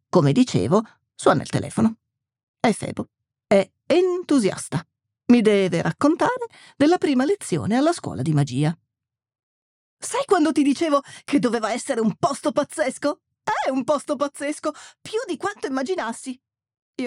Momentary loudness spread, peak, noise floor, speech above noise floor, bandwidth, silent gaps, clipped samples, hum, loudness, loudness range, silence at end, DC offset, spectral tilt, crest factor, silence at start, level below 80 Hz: 12 LU; -2 dBFS; -86 dBFS; 65 dB; 13.5 kHz; 2.43-2.54 s, 9.43-9.97 s, 16.82-16.94 s; under 0.1%; none; -22 LUFS; 5 LU; 0 s; under 0.1%; -6 dB/octave; 20 dB; 0.15 s; -62 dBFS